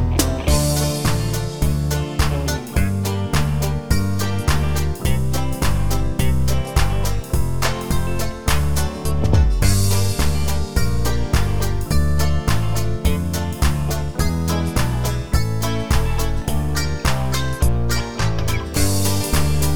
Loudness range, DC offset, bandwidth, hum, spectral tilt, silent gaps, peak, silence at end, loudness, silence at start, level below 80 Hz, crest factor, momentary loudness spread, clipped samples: 2 LU; 5%; over 20 kHz; none; -5 dB/octave; none; -2 dBFS; 0 s; -21 LUFS; 0 s; -24 dBFS; 16 dB; 4 LU; under 0.1%